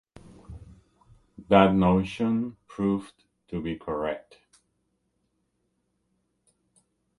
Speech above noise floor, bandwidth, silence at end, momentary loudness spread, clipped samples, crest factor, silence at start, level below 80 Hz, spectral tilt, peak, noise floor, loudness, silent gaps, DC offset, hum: 51 dB; 11 kHz; 3 s; 26 LU; under 0.1%; 26 dB; 0.5 s; -52 dBFS; -8 dB/octave; -2 dBFS; -75 dBFS; -25 LUFS; none; under 0.1%; none